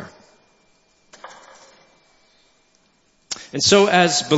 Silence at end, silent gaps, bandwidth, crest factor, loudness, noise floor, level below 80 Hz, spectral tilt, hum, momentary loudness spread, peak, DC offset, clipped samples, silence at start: 0 s; none; 8.2 kHz; 22 dB; -16 LUFS; -61 dBFS; -62 dBFS; -3 dB/octave; none; 28 LU; 0 dBFS; under 0.1%; under 0.1%; 0 s